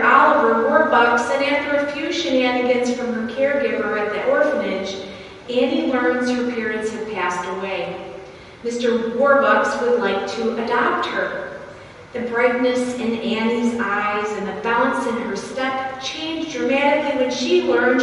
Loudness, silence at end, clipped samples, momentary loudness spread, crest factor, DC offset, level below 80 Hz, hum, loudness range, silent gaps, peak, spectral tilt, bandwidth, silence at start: -19 LUFS; 0 s; under 0.1%; 12 LU; 18 dB; under 0.1%; -56 dBFS; none; 4 LU; none; -2 dBFS; -4 dB/octave; 11.5 kHz; 0 s